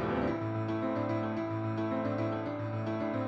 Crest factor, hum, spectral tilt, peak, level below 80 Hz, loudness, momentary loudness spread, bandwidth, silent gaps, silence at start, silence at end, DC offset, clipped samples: 14 dB; none; -9 dB/octave; -20 dBFS; -58 dBFS; -34 LUFS; 3 LU; 6.6 kHz; none; 0 s; 0 s; under 0.1%; under 0.1%